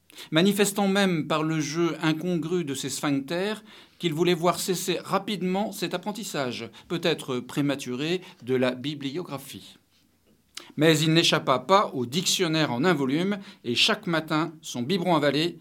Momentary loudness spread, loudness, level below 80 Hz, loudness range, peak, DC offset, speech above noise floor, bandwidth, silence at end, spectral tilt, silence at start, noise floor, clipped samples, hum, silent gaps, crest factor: 11 LU; -25 LUFS; -74 dBFS; 6 LU; -4 dBFS; under 0.1%; 39 dB; 19 kHz; 0 s; -4.5 dB/octave; 0.15 s; -64 dBFS; under 0.1%; none; none; 22 dB